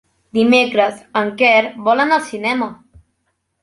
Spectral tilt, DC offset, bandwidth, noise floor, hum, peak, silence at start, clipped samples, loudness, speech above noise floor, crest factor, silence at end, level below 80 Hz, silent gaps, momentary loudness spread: -4.5 dB/octave; under 0.1%; 11.5 kHz; -69 dBFS; none; -2 dBFS; 0.35 s; under 0.1%; -15 LUFS; 54 dB; 16 dB; 0.9 s; -58 dBFS; none; 9 LU